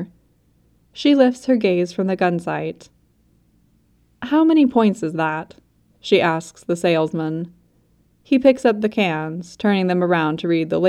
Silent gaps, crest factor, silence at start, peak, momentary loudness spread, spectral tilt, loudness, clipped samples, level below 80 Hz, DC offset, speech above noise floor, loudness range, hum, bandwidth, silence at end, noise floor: none; 18 dB; 0 s; -2 dBFS; 14 LU; -6.5 dB/octave; -19 LUFS; under 0.1%; -60 dBFS; under 0.1%; 41 dB; 3 LU; none; 12 kHz; 0 s; -59 dBFS